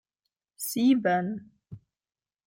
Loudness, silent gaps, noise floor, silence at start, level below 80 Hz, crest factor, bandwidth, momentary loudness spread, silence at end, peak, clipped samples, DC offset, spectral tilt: -26 LUFS; none; under -90 dBFS; 0.6 s; -72 dBFS; 18 dB; 16.5 kHz; 13 LU; 0.7 s; -12 dBFS; under 0.1%; under 0.1%; -5 dB/octave